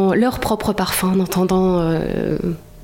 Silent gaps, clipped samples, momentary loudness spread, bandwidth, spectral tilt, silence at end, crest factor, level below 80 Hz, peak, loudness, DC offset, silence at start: none; under 0.1%; 5 LU; 17 kHz; -6 dB/octave; 0 s; 14 dB; -38 dBFS; -4 dBFS; -18 LUFS; under 0.1%; 0 s